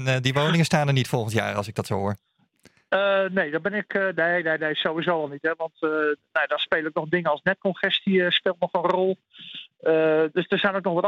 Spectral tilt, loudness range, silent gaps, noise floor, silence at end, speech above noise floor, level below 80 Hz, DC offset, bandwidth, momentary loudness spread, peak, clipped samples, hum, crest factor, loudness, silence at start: -5.5 dB/octave; 2 LU; none; -59 dBFS; 0 s; 36 dB; -66 dBFS; under 0.1%; 16 kHz; 7 LU; -6 dBFS; under 0.1%; none; 18 dB; -23 LUFS; 0 s